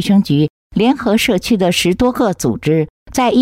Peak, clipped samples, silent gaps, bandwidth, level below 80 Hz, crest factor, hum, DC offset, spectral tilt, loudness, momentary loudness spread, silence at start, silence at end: -2 dBFS; under 0.1%; 0.50-0.70 s, 2.90-3.06 s; 16 kHz; -40 dBFS; 10 dB; none; under 0.1%; -5.5 dB/octave; -15 LUFS; 5 LU; 0 s; 0 s